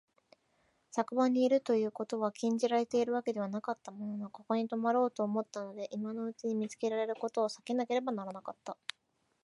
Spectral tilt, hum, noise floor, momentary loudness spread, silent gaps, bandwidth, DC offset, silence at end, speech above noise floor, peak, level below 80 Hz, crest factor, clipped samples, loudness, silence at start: -5.5 dB/octave; none; -74 dBFS; 12 LU; none; 11.5 kHz; under 0.1%; 0.7 s; 41 dB; -16 dBFS; -86 dBFS; 18 dB; under 0.1%; -34 LUFS; 0.95 s